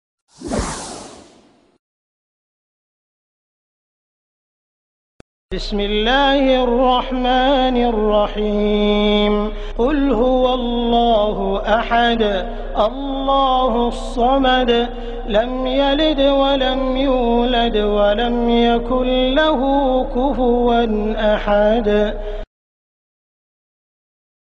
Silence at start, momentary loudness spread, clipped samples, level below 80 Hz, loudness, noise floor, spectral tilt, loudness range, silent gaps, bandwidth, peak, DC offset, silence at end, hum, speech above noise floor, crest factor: 0.4 s; 9 LU; under 0.1%; -28 dBFS; -17 LUFS; -51 dBFS; -5.5 dB/octave; 5 LU; 1.79-5.49 s; 11 kHz; -2 dBFS; under 0.1%; 2.15 s; none; 35 dB; 14 dB